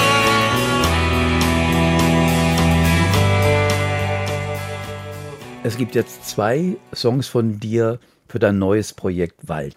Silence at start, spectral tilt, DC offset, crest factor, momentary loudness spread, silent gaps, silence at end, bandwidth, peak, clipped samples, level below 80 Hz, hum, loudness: 0 s; -5.5 dB/octave; under 0.1%; 14 dB; 12 LU; none; 0.05 s; 16 kHz; -4 dBFS; under 0.1%; -34 dBFS; none; -18 LUFS